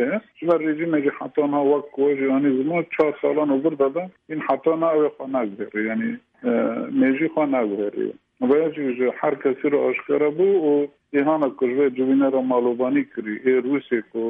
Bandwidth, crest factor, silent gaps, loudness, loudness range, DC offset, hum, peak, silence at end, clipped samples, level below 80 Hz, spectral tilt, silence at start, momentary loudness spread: 3.8 kHz; 14 dB; none; -22 LUFS; 3 LU; under 0.1%; none; -6 dBFS; 0 s; under 0.1%; -72 dBFS; -9.5 dB/octave; 0 s; 7 LU